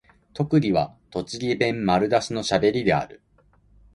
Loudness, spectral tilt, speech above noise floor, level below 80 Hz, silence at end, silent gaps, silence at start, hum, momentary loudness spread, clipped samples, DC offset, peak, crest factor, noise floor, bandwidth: -23 LUFS; -6 dB/octave; 37 dB; -52 dBFS; 0.8 s; none; 0.35 s; none; 11 LU; under 0.1%; under 0.1%; -6 dBFS; 18 dB; -59 dBFS; 11.5 kHz